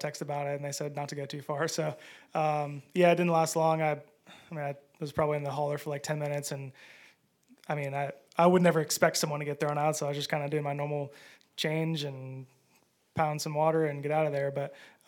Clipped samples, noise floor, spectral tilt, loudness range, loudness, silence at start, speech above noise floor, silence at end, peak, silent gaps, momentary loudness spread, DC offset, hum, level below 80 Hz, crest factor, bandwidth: under 0.1%; -68 dBFS; -5 dB/octave; 6 LU; -30 LUFS; 0 s; 38 dB; 0.2 s; -8 dBFS; none; 13 LU; under 0.1%; none; -72 dBFS; 24 dB; 18 kHz